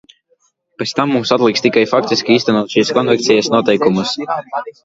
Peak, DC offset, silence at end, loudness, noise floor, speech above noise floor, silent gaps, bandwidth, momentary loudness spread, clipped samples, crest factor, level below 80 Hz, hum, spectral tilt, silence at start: 0 dBFS; under 0.1%; 0.15 s; -14 LUFS; -60 dBFS; 46 dB; none; 7.8 kHz; 8 LU; under 0.1%; 14 dB; -56 dBFS; none; -4.5 dB/octave; 0.8 s